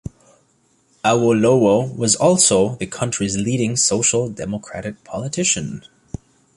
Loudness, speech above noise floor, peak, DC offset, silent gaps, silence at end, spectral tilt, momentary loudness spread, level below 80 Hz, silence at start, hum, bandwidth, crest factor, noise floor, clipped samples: -17 LUFS; 42 dB; -2 dBFS; under 0.1%; none; 0.75 s; -4 dB/octave; 19 LU; -48 dBFS; 0.05 s; none; 11.5 kHz; 16 dB; -60 dBFS; under 0.1%